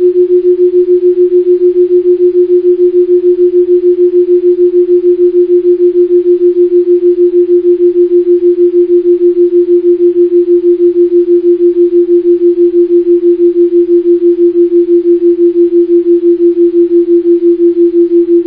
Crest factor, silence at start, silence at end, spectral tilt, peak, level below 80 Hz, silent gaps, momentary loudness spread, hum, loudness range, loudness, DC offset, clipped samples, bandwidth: 6 dB; 0 s; 0 s; -10.5 dB/octave; 0 dBFS; -50 dBFS; none; 1 LU; none; 0 LU; -7 LUFS; under 0.1%; under 0.1%; 1.1 kHz